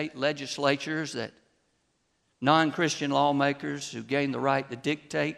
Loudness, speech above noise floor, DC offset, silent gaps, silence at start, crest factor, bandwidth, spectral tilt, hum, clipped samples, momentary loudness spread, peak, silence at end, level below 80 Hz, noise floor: -28 LUFS; 46 dB; under 0.1%; none; 0 s; 22 dB; 12.5 kHz; -4.5 dB/octave; none; under 0.1%; 11 LU; -6 dBFS; 0 s; -72 dBFS; -73 dBFS